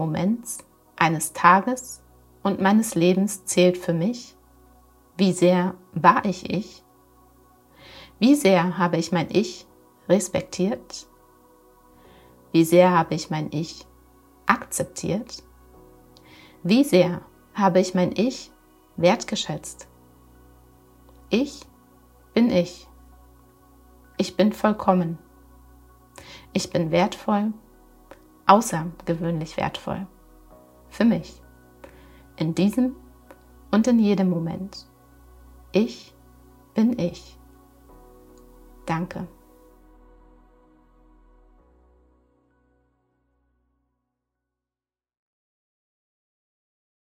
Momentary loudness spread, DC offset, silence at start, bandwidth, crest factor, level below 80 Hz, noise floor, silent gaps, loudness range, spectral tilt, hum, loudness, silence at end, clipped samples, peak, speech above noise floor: 21 LU; under 0.1%; 0 s; 16 kHz; 24 dB; -56 dBFS; under -90 dBFS; none; 8 LU; -5.5 dB/octave; none; -22 LUFS; 7.75 s; under 0.1%; 0 dBFS; over 69 dB